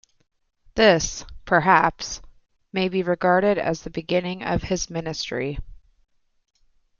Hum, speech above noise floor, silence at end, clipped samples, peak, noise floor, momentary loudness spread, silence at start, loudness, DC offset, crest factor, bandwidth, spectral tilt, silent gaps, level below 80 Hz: none; 28 dB; 1.25 s; under 0.1%; -2 dBFS; -50 dBFS; 15 LU; 0.75 s; -22 LUFS; under 0.1%; 22 dB; 7.4 kHz; -4.5 dB/octave; none; -44 dBFS